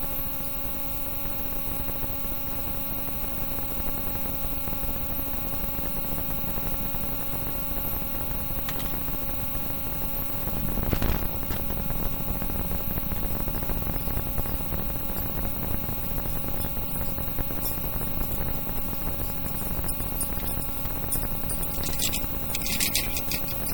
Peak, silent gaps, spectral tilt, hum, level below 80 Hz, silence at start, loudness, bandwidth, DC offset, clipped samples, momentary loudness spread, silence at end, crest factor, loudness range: -4 dBFS; none; -4 dB/octave; none; -34 dBFS; 0 s; -27 LUFS; over 20 kHz; 0.9%; under 0.1%; 2 LU; 0 s; 24 dB; 1 LU